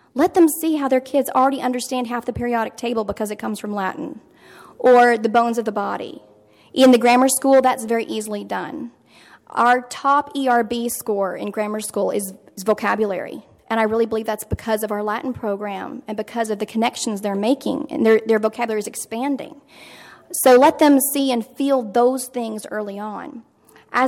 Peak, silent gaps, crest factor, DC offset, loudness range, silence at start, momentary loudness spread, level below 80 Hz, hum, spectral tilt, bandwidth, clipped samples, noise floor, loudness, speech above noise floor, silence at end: -4 dBFS; none; 16 dB; under 0.1%; 6 LU; 0.15 s; 14 LU; -52 dBFS; none; -4 dB/octave; 17.5 kHz; under 0.1%; -49 dBFS; -19 LUFS; 30 dB; 0 s